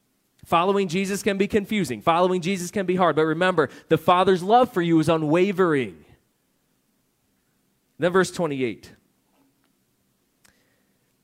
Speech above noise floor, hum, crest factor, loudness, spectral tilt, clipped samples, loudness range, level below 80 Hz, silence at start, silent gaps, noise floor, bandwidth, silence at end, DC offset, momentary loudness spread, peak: 48 dB; none; 20 dB; -22 LUFS; -5.5 dB/octave; under 0.1%; 8 LU; -60 dBFS; 0.5 s; none; -69 dBFS; 16 kHz; 2.35 s; under 0.1%; 7 LU; -4 dBFS